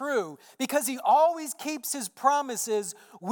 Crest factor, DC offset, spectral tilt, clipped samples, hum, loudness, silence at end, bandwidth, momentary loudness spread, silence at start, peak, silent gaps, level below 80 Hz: 18 dB; under 0.1%; -2.5 dB/octave; under 0.1%; none; -27 LUFS; 0 s; 19 kHz; 13 LU; 0 s; -10 dBFS; none; under -90 dBFS